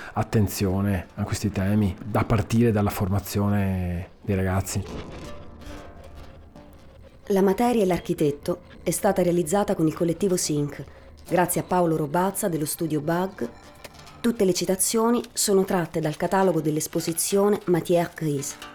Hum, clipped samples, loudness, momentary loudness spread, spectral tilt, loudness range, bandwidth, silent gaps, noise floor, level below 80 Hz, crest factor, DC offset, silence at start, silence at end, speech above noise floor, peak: none; under 0.1%; -24 LUFS; 14 LU; -5.5 dB/octave; 5 LU; over 20 kHz; none; -47 dBFS; -46 dBFS; 16 dB; under 0.1%; 0 s; 0 s; 24 dB; -8 dBFS